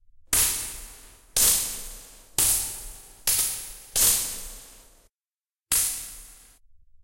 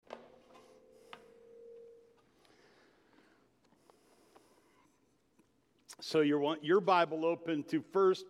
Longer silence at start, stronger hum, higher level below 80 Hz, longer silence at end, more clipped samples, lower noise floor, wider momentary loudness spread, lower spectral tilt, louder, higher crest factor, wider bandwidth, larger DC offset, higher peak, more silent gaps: first, 0.3 s vs 0.1 s; neither; first, -46 dBFS vs -86 dBFS; first, 0.7 s vs 0 s; neither; first, under -90 dBFS vs -73 dBFS; second, 21 LU vs 26 LU; second, 0.5 dB/octave vs -5.5 dB/octave; first, -23 LUFS vs -32 LUFS; about the same, 22 dB vs 20 dB; first, 16.5 kHz vs 12.5 kHz; neither; first, -6 dBFS vs -16 dBFS; neither